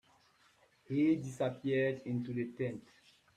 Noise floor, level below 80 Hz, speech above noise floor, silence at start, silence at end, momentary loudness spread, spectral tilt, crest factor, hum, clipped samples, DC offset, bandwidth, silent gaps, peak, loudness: -69 dBFS; -76 dBFS; 34 dB; 0.9 s; 0.55 s; 9 LU; -7.5 dB/octave; 16 dB; none; under 0.1%; under 0.1%; 10.5 kHz; none; -20 dBFS; -35 LUFS